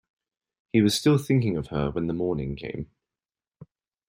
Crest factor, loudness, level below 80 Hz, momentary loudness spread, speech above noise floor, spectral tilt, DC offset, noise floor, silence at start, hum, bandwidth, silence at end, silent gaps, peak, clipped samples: 18 dB; -25 LUFS; -50 dBFS; 14 LU; over 66 dB; -6 dB/octave; under 0.1%; under -90 dBFS; 0.75 s; none; 16 kHz; 0.45 s; none; -8 dBFS; under 0.1%